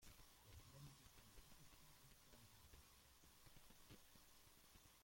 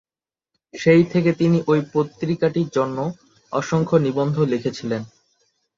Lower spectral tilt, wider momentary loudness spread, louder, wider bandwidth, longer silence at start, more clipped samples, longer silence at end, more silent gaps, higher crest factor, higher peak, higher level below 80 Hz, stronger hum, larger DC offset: second, -3 dB/octave vs -7.5 dB/octave; second, 5 LU vs 12 LU; second, -67 LUFS vs -20 LUFS; first, 16.5 kHz vs 7.6 kHz; second, 0 s vs 0.75 s; neither; second, 0 s vs 0.7 s; neither; about the same, 16 dB vs 18 dB; second, -50 dBFS vs -2 dBFS; second, -74 dBFS vs -58 dBFS; neither; neither